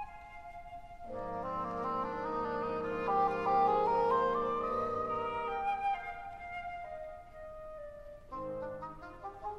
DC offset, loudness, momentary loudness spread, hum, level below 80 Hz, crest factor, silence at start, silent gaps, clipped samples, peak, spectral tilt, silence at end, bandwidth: under 0.1%; -35 LUFS; 19 LU; none; -56 dBFS; 18 dB; 0 s; none; under 0.1%; -18 dBFS; -7 dB/octave; 0 s; 9.4 kHz